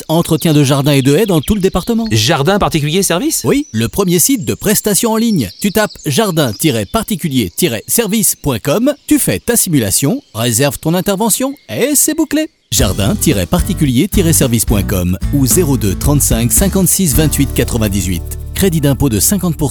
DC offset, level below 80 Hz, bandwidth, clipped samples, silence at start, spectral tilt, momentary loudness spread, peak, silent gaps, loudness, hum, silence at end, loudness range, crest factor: under 0.1%; -26 dBFS; over 20 kHz; under 0.1%; 0 s; -4.5 dB/octave; 5 LU; 0 dBFS; none; -12 LUFS; none; 0 s; 2 LU; 12 dB